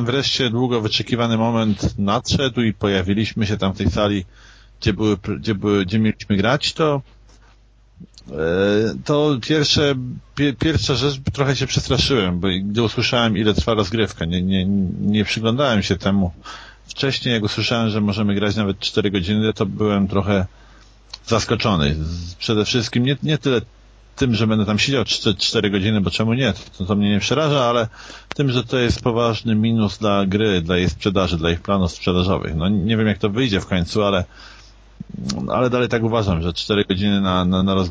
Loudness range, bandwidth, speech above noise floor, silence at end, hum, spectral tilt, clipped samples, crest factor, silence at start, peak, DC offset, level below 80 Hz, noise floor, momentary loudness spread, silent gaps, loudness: 2 LU; 8 kHz; 32 dB; 0 s; none; -5.5 dB/octave; under 0.1%; 18 dB; 0 s; -2 dBFS; under 0.1%; -36 dBFS; -51 dBFS; 5 LU; none; -19 LUFS